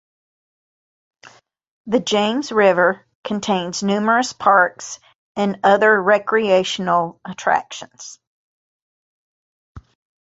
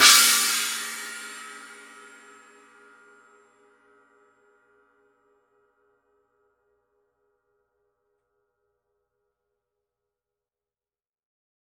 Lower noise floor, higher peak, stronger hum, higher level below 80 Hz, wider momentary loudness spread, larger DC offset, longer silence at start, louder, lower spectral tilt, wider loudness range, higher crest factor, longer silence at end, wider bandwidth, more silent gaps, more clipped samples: second, -49 dBFS vs under -90 dBFS; about the same, -2 dBFS vs -2 dBFS; neither; first, -60 dBFS vs -84 dBFS; second, 18 LU vs 30 LU; neither; first, 1.25 s vs 0 s; about the same, -17 LUFS vs -19 LUFS; first, -4 dB/octave vs 3.5 dB/octave; second, 6 LU vs 29 LU; second, 18 dB vs 28 dB; second, 0.45 s vs 10 s; second, 8 kHz vs 16.5 kHz; first, 1.68-1.85 s, 3.15-3.23 s, 5.15-5.35 s, 8.27-9.75 s vs none; neither